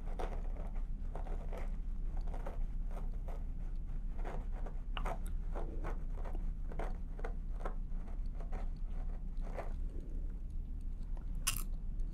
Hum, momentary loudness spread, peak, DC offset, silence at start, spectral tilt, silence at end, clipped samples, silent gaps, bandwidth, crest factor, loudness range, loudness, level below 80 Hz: none; 4 LU; -16 dBFS; under 0.1%; 0 s; -4.5 dB/octave; 0 s; under 0.1%; none; 15 kHz; 22 dB; 2 LU; -45 LUFS; -38 dBFS